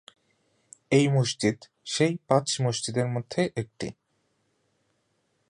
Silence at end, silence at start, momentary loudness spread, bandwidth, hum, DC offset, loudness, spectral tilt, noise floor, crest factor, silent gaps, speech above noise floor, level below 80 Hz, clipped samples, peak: 1.6 s; 0.9 s; 13 LU; 11 kHz; none; under 0.1%; -26 LUFS; -5 dB/octave; -73 dBFS; 22 dB; none; 47 dB; -64 dBFS; under 0.1%; -6 dBFS